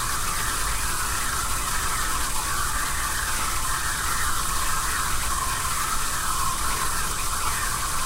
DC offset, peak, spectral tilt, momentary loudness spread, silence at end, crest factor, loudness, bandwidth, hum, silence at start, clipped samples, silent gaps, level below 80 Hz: under 0.1%; -12 dBFS; -1 dB/octave; 1 LU; 0 s; 12 dB; -25 LUFS; 16 kHz; none; 0 s; under 0.1%; none; -32 dBFS